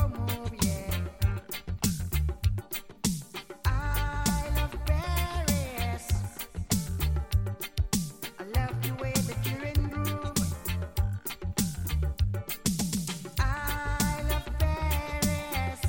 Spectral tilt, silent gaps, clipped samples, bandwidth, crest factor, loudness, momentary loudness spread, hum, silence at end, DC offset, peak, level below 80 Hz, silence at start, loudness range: -4.5 dB/octave; none; under 0.1%; 17 kHz; 18 dB; -31 LUFS; 4 LU; none; 0 s; 0.1%; -12 dBFS; -34 dBFS; 0 s; 1 LU